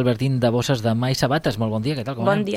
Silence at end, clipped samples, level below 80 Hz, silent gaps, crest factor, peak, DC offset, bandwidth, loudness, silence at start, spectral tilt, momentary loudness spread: 0 s; under 0.1%; -48 dBFS; none; 16 dB; -4 dBFS; under 0.1%; 16 kHz; -21 LUFS; 0 s; -6 dB/octave; 4 LU